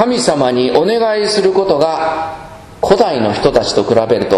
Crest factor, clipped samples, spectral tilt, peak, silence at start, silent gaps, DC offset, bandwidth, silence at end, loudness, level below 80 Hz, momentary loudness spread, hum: 12 dB; 0.2%; -4.5 dB/octave; 0 dBFS; 0 s; none; under 0.1%; 12.5 kHz; 0 s; -13 LUFS; -40 dBFS; 6 LU; none